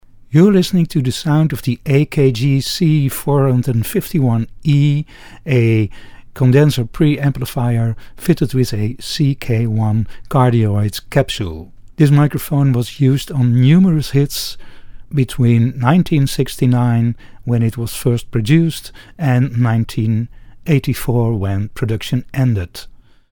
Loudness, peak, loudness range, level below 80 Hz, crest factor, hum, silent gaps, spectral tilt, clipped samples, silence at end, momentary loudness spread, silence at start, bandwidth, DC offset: -16 LUFS; 0 dBFS; 3 LU; -38 dBFS; 14 dB; none; none; -7 dB/octave; under 0.1%; 0.35 s; 9 LU; 0.3 s; 19.5 kHz; under 0.1%